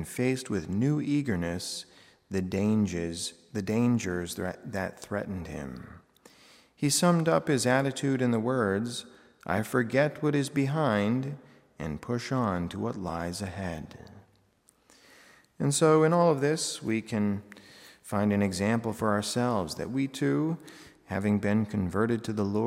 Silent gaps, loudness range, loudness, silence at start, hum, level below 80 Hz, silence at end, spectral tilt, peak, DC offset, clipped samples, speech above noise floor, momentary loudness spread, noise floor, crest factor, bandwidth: none; 6 LU; -29 LUFS; 0 s; none; -62 dBFS; 0 s; -5.5 dB/octave; -10 dBFS; under 0.1%; under 0.1%; 38 dB; 13 LU; -66 dBFS; 20 dB; 16 kHz